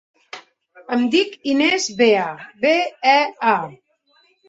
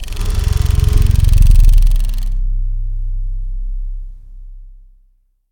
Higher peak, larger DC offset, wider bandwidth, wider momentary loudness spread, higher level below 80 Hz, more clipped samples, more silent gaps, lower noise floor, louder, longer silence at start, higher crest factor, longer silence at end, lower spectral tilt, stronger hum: about the same, -2 dBFS vs 0 dBFS; neither; second, 8.2 kHz vs 16 kHz; first, 21 LU vs 15 LU; second, -68 dBFS vs -14 dBFS; second, under 0.1% vs 0.3%; neither; first, -60 dBFS vs -54 dBFS; about the same, -18 LUFS vs -17 LUFS; first, 0.35 s vs 0 s; first, 18 dB vs 12 dB; about the same, 0.75 s vs 0.8 s; second, -3 dB/octave vs -6 dB/octave; neither